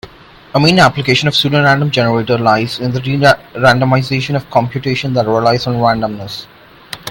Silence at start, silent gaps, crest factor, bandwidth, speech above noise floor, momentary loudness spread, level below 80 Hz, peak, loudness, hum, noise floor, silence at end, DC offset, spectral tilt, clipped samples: 0.05 s; none; 14 dB; 17 kHz; 26 dB; 8 LU; -44 dBFS; 0 dBFS; -12 LUFS; none; -38 dBFS; 0 s; under 0.1%; -5.5 dB/octave; under 0.1%